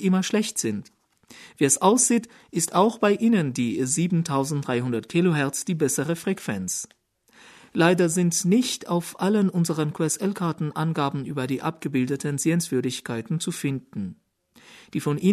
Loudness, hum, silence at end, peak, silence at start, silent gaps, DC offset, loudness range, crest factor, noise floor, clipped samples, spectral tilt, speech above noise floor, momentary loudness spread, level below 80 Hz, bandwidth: -24 LUFS; none; 0 s; -4 dBFS; 0 s; none; under 0.1%; 5 LU; 20 dB; -55 dBFS; under 0.1%; -5 dB/octave; 32 dB; 9 LU; -66 dBFS; 13.5 kHz